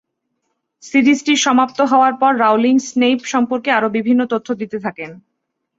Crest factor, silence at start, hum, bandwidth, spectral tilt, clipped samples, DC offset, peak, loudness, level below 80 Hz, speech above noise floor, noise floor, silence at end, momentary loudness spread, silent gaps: 14 dB; 0.85 s; none; 7.8 kHz; -3.5 dB/octave; under 0.1%; under 0.1%; -2 dBFS; -15 LUFS; -64 dBFS; 59 dB; -74 dBFS; 0.6 s; 11 LU; none